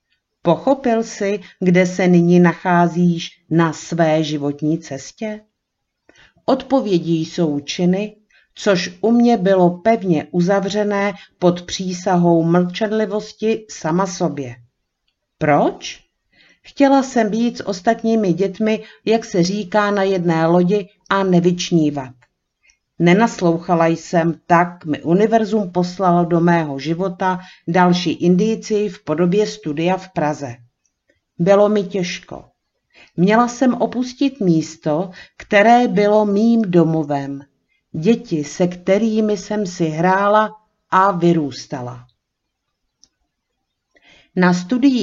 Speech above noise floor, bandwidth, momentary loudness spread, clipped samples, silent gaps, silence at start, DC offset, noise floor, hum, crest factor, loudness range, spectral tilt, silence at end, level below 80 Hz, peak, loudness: 59 dB; 7.6 kHz; 10 LU; under 0.1%; none; 0.45 s; under 0.1%; -76 dBFS; none; 16 dB; 5 LU; -6.5 dB/octave; 0 s; -58 dBFS; 0 dBFS; -17 LUFS